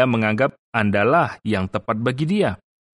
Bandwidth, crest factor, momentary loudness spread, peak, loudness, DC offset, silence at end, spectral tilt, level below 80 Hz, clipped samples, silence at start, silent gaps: 11 kHz; 16 dB; 7 LU; -4 dBFS; -21 LUFS; under 0.1%; 0.4 s; -7.5 dB/octave; -54 dBFS; under 0.1%; 0 s; 0.59-0.72 s